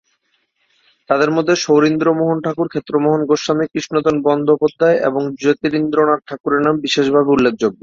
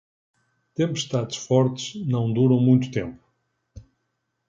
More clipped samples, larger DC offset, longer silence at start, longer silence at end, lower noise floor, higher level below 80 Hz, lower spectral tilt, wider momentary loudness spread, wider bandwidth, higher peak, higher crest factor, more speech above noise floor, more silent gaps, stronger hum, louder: neither; neither; first, 1.1 s vs 0.8 s; second, 0.1 s vs 0.65 s; second, -65 dBFS vs -76 dBFS; about the same, -56 dBFS vs -56 dBFS; about the same, -5.5 dB/octave vs -6.5 dB/octave; second, 5 LU vs 12 LU; about the same, 7.6 kHz vs 7.6 kHz; first, -2 dBFS vs -6 dBFS; about the same, 14 dB vs 18 dB; second, 50 dB vs 55 dB; first, 6.40-6.44 s vs none; neither; first, -16 LUFS vs -23 LUFS